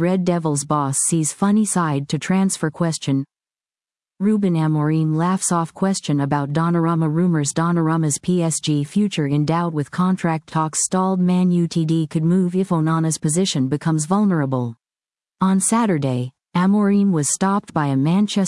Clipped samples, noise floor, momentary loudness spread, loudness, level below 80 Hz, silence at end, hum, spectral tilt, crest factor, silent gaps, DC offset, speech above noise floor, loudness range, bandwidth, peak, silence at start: under 0.1%; under -90 dBFS; 5 LU; -19 LUFS; -62 dBFS; 0 s; none; -5.5 dB/octave; 14 dB; none; under 0.1%; over 72 dB; 2 LU; 12 kHz; -4 dBFS; 0 s